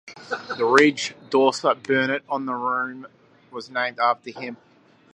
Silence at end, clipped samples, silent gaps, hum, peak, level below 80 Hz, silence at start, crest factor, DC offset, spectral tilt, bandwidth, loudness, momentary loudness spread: 0.6 s; under 0.1%; none; none; 0 dBFS; -76 dBFS; 0.05 s; 24 dB; under 0.1%; -4 dB/octave; 10.5 kHz; -22 LUFS; 18 LU